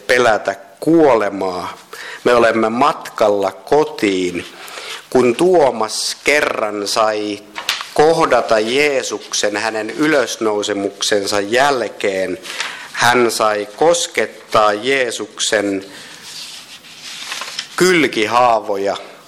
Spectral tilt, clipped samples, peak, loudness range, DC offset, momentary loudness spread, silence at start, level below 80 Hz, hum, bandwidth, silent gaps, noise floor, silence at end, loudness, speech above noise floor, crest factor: -3 dB/octave; under 0.1%; -2 dBFS; 2 LU; under 0.1%; 15 LU; 0.1 s; -54 dBFS; none; 16.5 kHz; none; -36 dBFS; 0.1 s; -16 LUFS; 21 dB; 14 dB